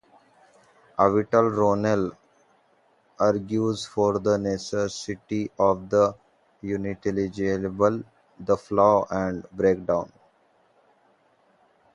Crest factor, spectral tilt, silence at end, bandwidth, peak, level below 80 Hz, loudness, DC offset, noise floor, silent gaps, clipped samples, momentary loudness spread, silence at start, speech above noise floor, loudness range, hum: 22 dB; -6.5 dB/octave; 1.85 s; 11 kHz; -4 dBFS; -56 dBFS; -24 LUFS; under 0.1%; -63 dBFS; none; under 0.1%; 10 LU; 1 s; 40 dB; 2 LU; none